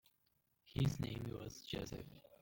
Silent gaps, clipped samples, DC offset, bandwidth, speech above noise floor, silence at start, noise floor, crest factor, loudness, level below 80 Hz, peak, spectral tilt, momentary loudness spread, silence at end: none; under 0.1%; under 0.1%; 17 kHz; 38 dB; 0.65 s; -81 dBFS; 18 dB; -44 LUFS; -60 dBFS; -26 dBFS; -6 dB/octave; 12 LU; 0.05 s